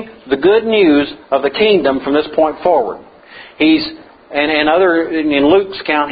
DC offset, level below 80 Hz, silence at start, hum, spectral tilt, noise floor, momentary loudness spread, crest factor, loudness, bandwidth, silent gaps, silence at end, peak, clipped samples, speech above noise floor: under 0.1%; -48 dBFS; 0 s; none; -9 dB/octave; -38 dBFS; 7 LU; 14 dB; -13 LUFS; 5 kHz; none; 0 s; 0 dBFS; under 0.1%; 25 dB